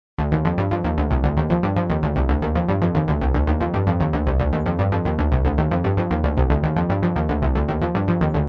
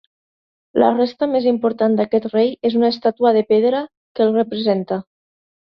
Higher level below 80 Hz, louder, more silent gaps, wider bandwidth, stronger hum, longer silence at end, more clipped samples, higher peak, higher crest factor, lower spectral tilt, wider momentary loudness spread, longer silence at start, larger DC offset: first, -26 dBFS vs -62 dBFS; second, -21 LUFS vs -18 LUFS; second, none vs 3.97-4.15 s; second, 5.4 kHz vs 6 kHz; neither; second, 0 s vs 0.75 s; neither; about the same, -4 dBFS vs -2 dBFS; about the same, 16 dB vs 16 dB; first, -10 dB/octave vs -8.5 dB/octave; second, 2 LU vs 7 LU; second, 0.2 s vs 0.75 s; neither